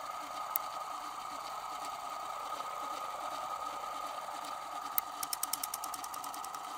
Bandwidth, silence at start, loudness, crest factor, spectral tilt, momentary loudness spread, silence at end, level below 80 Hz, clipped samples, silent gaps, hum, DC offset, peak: 18 kHz; 0 s; -39 LUFS; 34 dB; 0 dB/octave; 6 LU; 0 s; -76 dBFS; under 0.1%; none; none; under 0.1%; -6 dBFS